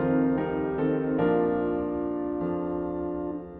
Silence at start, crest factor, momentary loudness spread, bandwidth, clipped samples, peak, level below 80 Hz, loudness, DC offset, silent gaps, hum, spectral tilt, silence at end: 0 s; 14 dB; 7 LU; 3.9 kHz; under 0.1%; -12 dBFS; -50 dBFS; -28 LUFS; under 0.1%; none; none; -11.5 dB/octave; 0 s